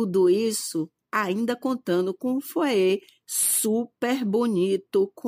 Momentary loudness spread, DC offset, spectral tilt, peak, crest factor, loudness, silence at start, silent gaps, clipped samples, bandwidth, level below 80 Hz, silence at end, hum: 8 LU; under 0.1%; -4 dB/octave; -10 dBFS; 14 dB; -24 LUFS; 0 s; none; under 0.1%; 16 kHz; -76 dBFS; 0 s; none